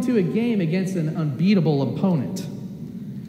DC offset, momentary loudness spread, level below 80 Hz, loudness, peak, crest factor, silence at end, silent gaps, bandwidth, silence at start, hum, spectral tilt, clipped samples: under 0.1%; 15 LU; -62 dBFS; -22 LUFS; -8 dBFS; 14 dB; 0 s; none; 15 kHz; 0 s; none; -8 dB/octave; under 0.1%